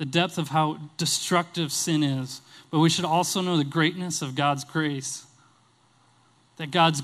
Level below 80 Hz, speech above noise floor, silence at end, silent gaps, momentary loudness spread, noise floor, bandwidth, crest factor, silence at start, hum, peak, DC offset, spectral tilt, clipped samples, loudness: -70 dBFS; 37 dB; 0 s; none; 10 LU; -62 dBFS; 15.5 kHz; 20 dB; 0 s; none; -6 dBFS; under 0.1%; -4 dB/octave; under 0.1%; -25 LUFS